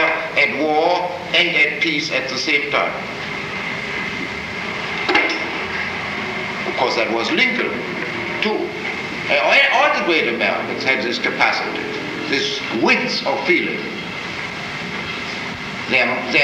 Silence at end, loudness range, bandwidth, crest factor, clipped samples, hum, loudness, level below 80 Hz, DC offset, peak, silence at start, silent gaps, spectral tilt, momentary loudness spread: 0 s; 4 LU; 15.5 kHz; 18 dB; under 0.1%; none; -18 LUFS; -52 dBFS; under 0.1%; -2 dBFS; 0 s; none; -3.5 dB/octave; 10 LU